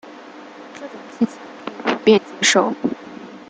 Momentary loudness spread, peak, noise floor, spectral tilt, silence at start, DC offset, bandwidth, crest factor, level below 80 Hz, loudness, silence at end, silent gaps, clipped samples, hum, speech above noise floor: 23 LU; -2 dBFS; -39 dBFS; -3 dB/octave; 0.05 s; under 0.1%; 9.6 kHz; 20 dB; -66 dBFS; -18 LUFS; 0.1 s; none; under 0.1%; none; 20 dB